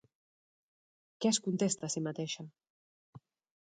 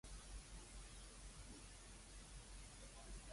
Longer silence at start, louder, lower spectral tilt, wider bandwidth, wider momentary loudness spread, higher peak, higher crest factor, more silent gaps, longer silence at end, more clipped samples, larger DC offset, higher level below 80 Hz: first, 1.2 s vs 0.05 s; first, -34 LUFS vs -58 LUFS; about the same, -4 dB/octave vs -3 dB/octave; second, 9.4 kHz vs 11.5 kHz; first, 11 LU vs 2 LU; first, -18 dBFS vs -44 dBFS; first, 20 dB vs 14 dB; first, 2.70-3.13 s vs none; first, 0.45 s vs 0 s; neither; neither; second, -80 dBFS vs -60 dBFS